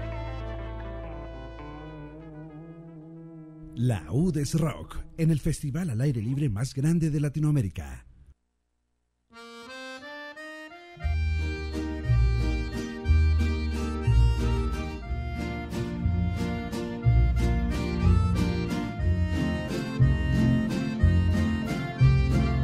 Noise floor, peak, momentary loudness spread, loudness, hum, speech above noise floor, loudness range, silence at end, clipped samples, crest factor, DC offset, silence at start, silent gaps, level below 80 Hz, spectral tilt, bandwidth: -76 dBFS; -10 dBFS; 18 LU; -27 LUFS; none; 49 dB; 10 LU; 0 s; under 0.1%; 18 dB; under 0.1%; 0 s; none; -32 dBFS; -7 dB/octave; 14 kHz